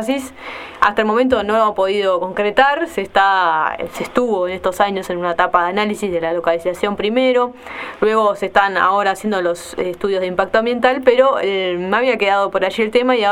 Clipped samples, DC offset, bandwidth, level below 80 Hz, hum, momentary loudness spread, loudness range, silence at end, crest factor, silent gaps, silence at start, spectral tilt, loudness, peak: under 0.1%; under 0.1%; 15.5 kHz; -50 dBFS; none; 7 LU; 2 LU; 0 s; 16 dB; none; 0 s; -4.5 dB/octave; -16 LUFS; 0 dBFS